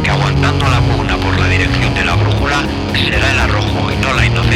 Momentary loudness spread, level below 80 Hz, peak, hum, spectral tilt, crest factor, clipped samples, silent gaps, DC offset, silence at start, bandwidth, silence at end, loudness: 3 LU; -22 dBFS; 0 dBFS; none; -5.5 dB/octave; 12 dB; under 0.1%; none; under 0.1%; 0 s; 13 kHz; 0 s; -13 LUFS